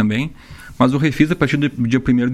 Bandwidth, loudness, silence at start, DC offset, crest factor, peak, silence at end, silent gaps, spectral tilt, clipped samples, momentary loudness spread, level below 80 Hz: 13 kHz; -17 LUFS; 0 s; under 0.1%; 16 dB; -2 dBFS; 0 s; none; -7 dB/octave; under 0.1%; 5 LU; -40 dBFS